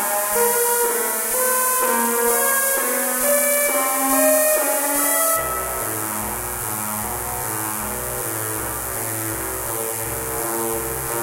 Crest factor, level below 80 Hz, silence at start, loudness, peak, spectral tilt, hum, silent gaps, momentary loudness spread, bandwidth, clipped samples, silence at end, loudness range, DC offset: 18 dB; -44 dBFS; 0 s; -19 LUFS; -2 dBFS; -2 dB/octave; none; none; 8 LU; 16 kHz; under 0.1%; 0 s; 7 LU; under 0.1%